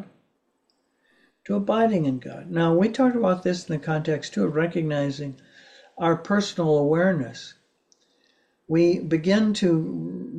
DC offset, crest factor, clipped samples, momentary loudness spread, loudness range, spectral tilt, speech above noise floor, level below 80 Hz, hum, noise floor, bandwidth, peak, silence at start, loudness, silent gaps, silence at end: under 0.1%; 16 dB; under 0.1%; 10 LU; 2 LU; -7 dB/octave; 48 dB; -64 dBFS; none; -71 dBFS; 9.6 kHz; -8 dBFS; 0 s; -23 LUFS; none; 0 s